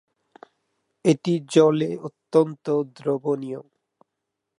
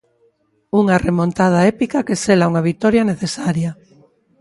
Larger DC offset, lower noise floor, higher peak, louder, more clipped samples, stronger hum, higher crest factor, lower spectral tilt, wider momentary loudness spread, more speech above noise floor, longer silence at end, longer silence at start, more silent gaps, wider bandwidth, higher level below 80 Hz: neither; first, -82 dBFS vs -60 dBFS; second, -4 dBFS vs 0 dBFS; second, -22 LUFS vs -16 LUFS; neither; neither; about the same, 20 dB vs 16 dB; about the same, -6.5 dB/octave vs -6.5 dB/octave; first, 12 LU vs 6 LU; first, 60 dB vs 44 dB; first, 0.95 s vs 0.7 s; first, 1.05 s vs 0.75 s; neither; about the same, 11 kHz vs 11.5 kHz; second, -76 dBFS vs -46 dBFS